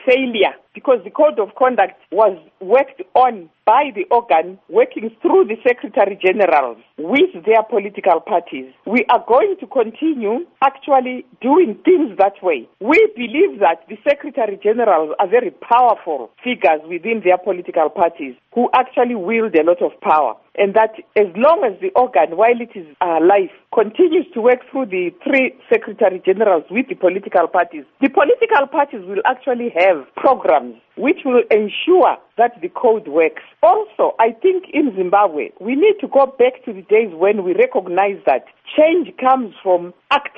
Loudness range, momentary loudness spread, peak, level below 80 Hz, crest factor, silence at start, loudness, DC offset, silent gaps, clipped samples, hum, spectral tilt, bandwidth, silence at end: 1 LU; 7 LU; -2 dBFS; -64 dBFS; 14 dB; 0.05 s; -16 LUFS; under 0.1%; none; under 0.1%; none; -2.5 dB/octave; 5.4 kHz; 0.1 s